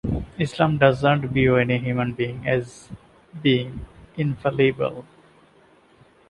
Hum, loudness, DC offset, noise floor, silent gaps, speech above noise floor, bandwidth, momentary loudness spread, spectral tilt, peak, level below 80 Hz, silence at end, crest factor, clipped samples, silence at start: none; -22 LUFS; under 0.1%; -55 dBFS; none; 34 dB; 11 kHz; 18 LU; -7.5 dB/octave; -4 dBFS; -44 dBFS; 1.25 s; 20 dB; under 0.1%; 0.05 s